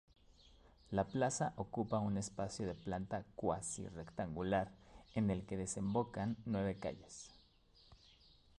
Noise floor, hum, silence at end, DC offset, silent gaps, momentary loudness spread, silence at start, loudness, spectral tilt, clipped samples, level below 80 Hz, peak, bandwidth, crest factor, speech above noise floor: -68 dBFS; none; 0.65 s; under 0.1%; none; 9 LU; 0.45 s; -41 LUFS; -5.5 dB/octave; under 0.1%; -62 dBFS; -22 dBFS; 11.5 kHz; 20 dB; 28 dB